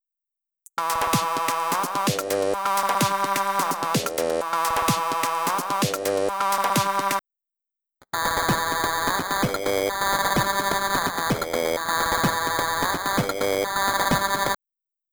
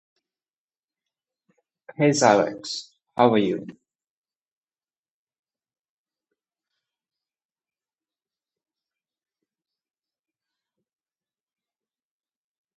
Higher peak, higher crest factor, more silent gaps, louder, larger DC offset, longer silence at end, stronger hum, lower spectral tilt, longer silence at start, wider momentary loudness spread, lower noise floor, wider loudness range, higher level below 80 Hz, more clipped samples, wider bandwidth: second, -8 dBFS vs -2 dBFS; second, 18 dB vs 28 dB; neither; about the same, -23 LUFS vs -21 LUFS; neither; second, 0.55 s vs 9.05 s; neither; second, -3 dB/octave vs -4.5 dB/octave; second, 0.75 s vs 2 s; second, 3 LU vs 15 LU; about the same, -87 dBFS vs under -90 dBFS; about the same, 2 LU vs 4 LU; first, -50 dBFS vs -74 dBFS; neither; first, over 20 kHz vs 8.4 kHz